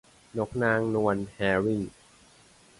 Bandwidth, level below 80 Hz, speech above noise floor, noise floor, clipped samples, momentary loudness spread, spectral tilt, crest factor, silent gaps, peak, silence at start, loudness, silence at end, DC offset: 11.5 kHz; -56 dBFS; 30 dB; -57 dBFS; under 0.1%; 10 LU; -7 dB/octave; 18 dB; none; -10 dBFS; 0.35 s; -28 LUFS; 0.9 s; under 0.1%